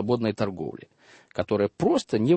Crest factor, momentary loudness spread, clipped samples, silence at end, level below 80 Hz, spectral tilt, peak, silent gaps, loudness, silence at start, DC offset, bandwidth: 16 dB; 13 LU; under 0.1%; 0 s; -58 dBFS; -7 dB/octave; -10 dBFS; none; -27 LUFS; 0 s; under 0.1%; 8.8 kHz